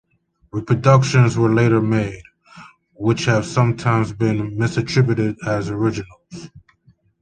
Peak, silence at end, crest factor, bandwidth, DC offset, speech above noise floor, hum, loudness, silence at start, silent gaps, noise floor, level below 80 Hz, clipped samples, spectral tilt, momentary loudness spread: -2 dBFS; 0.6 s; 18 dB; 9.2 kHz; under 0.1%; 43 dB; none; -18 LUFS; 0.55 s; none; -60 dBFS; -48 dBFS; under 0.1%; -7 dB/octave; 16 LU